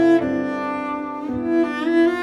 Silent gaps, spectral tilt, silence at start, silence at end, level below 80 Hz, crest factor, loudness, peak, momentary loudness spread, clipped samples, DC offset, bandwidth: none; -6.5 dB/octave; 0 s; 0 s; -54 dBFS; 12 dB; -21 LUFS; -8 dBFS; 9 LU; under 0.1%; under 0.1%; 7 kHz